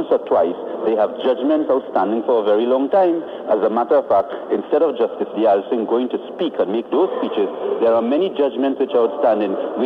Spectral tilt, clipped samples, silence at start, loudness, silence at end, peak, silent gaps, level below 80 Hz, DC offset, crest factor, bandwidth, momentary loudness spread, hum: -8 dB/octave; under 0.1%; 0 s; -18 LUFS; 0 s; -6 dBFS; none; -64 dBFS; under 0.1%; 12 dB; 5 kHz; 5 LU; none